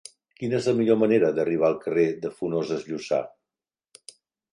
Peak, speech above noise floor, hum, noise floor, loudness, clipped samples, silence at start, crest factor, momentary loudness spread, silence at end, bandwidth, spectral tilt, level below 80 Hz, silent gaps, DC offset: -6 dBFS; over 67 dB; none; under -90 dBFS; -24 LUFS; under 0.1%; 0.4 s; 18 dB; 10 LU; 1.25 s; 11 kHz; -6.5 dB/octave; -68 dBFS; none; under 0.1%